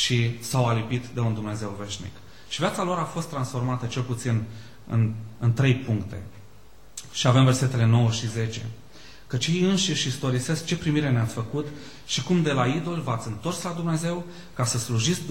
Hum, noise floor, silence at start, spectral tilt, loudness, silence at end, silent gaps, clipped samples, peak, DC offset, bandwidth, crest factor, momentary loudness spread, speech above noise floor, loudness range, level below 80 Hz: none; -52 dBFS; 0 s; -5 dB/octave; -25 LUFS; 0 s; none; under 0.1%; -6 dBFS; 0.6%; 16 kHz; 18 dB; 14 LU; 27 dB; 5 LU; -54 dBFS